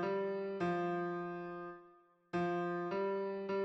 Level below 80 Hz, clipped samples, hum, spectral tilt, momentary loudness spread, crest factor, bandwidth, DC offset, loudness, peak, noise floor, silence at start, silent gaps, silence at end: -78 dBFS; under 0.1%; none; -8 dB/octave; 9 LU; 12 dB; 7.4 kHz; under 0.1%; -39 LUFS; -28 dBFS; -65 dBFS; 0 s; none; 0 s